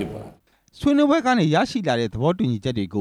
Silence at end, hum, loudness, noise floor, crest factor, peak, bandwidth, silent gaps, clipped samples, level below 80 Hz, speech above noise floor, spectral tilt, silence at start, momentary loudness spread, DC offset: 0 s; none; -21 LUFS; -49 dBFS; 16 dB; -6 dBFS; 11 kHz; none; under 0.1%; -50 dBFS; 29 dB; -6.5 dB/octave; 0 s; 8 LU; under 0.1%